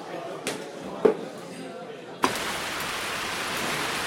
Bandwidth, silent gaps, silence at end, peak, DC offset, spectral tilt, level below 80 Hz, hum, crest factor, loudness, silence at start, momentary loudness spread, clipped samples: 16.5 kHz; none; 0 s; -6 dBFS; under 0.1%; -2.5 dB/octave; -60 dBFS; none; 24 dB; -29 LUFS; 0 s; 14 LU; under 0.1%